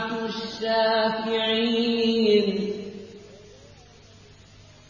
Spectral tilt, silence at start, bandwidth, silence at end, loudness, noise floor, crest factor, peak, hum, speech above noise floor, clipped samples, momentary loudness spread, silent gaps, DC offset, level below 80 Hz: -5.5 dB/octave; 0 s; 7.4 kHz; 1.35 s; -23 LUFS; -50 dBFS; 16 dB; -8 dBFS; none; 27 dB; under 0.1%; 15 LU; none; under 0.1%; -60 dBFS